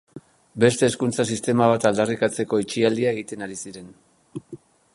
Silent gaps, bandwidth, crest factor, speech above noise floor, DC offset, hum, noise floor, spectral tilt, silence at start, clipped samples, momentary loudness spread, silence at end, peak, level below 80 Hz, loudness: none; 11.5 kHz; 20 dB; 24 dB; under 0.1%; none; -45 dBFS; -5 dB/octave; 0.15 s; under 0.1%; 20 LU; 0.4 s; -4 dBFS; -60 dBFS; -22 LUFS